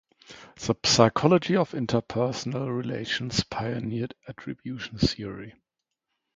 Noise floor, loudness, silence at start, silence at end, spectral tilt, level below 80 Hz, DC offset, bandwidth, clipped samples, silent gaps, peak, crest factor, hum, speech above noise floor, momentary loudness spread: -83 dBFS; -26 LUFS; 0.3 s; 0.85 s; -5 dB/octave; -50 dBFS; under 0.1%; 9.6 kHz; under 0.1%; none; -2 dBFS; 26 dB; none; 57 dB; 18 LU